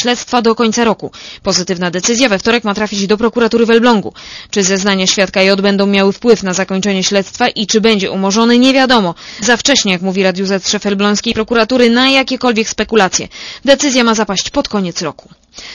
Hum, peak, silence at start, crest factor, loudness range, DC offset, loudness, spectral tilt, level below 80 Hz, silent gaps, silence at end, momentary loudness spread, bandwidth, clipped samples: none; 0 dBFS; 0 s; 12 dB; 2 LU; under 0.1%; -12 LUFS; -3.5 dB/octave; -44 dBFS; none; 0 s; 8 LU; 11 kHz; 0.3%